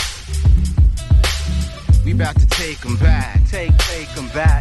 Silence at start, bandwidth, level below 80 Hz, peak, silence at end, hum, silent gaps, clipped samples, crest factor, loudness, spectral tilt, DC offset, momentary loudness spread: 0 s; 12.5 kHz; -16 dBFS; -2 dBFS; 0 s; none; none; under 0.1%; 12 dB; -17 LUFS; -5 dB/octave; under 0.1%; 7 LU